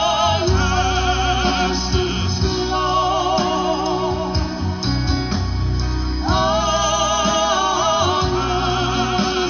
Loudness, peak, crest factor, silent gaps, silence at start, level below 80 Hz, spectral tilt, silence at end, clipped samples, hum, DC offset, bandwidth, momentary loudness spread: -19 LUFS; -4 dBFS; 14 dB; none; 0 s; -28 dBFS; -4.5 dB/octave; 0 s; under 0.1%; none; 0.2%; 6.8 kHz; 5 LU